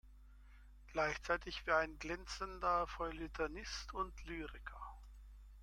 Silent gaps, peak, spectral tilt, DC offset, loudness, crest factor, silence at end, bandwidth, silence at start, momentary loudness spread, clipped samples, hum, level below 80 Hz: none; -20 dBFS; -4 dB/octave; under 0.1%; -41 LUFS; 22 dB; 0 s; 16 kHz; 0.05 s; 17 LU; under 0.1%; 50 Hz at -55 dBFS; -54 dBFS